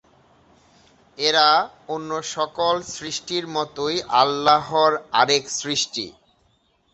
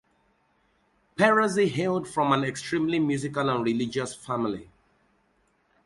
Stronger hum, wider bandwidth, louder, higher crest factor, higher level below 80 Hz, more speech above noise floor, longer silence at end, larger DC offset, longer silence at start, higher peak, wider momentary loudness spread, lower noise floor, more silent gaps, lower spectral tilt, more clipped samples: neither; second, 8.4 kHz vs 11.5 kHz; first, -21 LUFS vs -26 LUFS; about the same, 22 dB vs 20 dB; about the same, -62 dBFS vs -64 dBFS; about the same, 42 dB vs 43 dB; second, 0.85 s vs 1.25 s; neither; about the same, 1.2 s vs 1.2 s; first, -2 dBFS vs -8 dBFS; about the same, 12 LU vs 10 LU; second, -64 dBFS vs -68 dBFS; neither; second, -2 dB/octave vs -5.5 dB/octave; neither